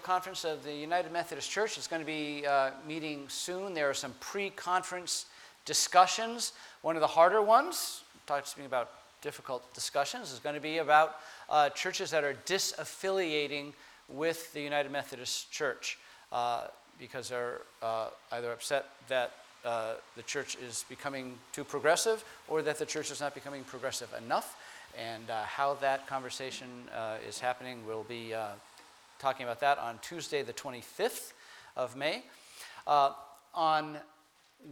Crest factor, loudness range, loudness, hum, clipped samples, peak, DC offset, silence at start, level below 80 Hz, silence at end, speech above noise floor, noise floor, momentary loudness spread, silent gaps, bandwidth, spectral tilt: 24 dB; 8 LU; -33 LUFS; none; under 0.1%; -10 dBFS; under 0.1%; 0 s; -78 dBFS; 0 s; 31 dB; -65 dBFS; 15 LU; none; 19 kHz; -2 dB/octave